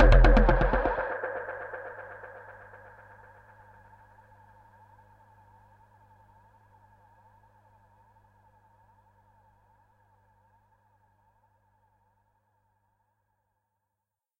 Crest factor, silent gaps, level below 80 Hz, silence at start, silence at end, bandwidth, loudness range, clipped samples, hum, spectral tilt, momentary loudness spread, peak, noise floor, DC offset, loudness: 24 dB; none; -32 dBFS; 0 s; 12.15 s; 5.2 kHz; 30 LU; under 0.1%; none; -8 dB/octave; 31 LU; -6 dBFS; -87 dBFS; under 0.1%; -27 LUFS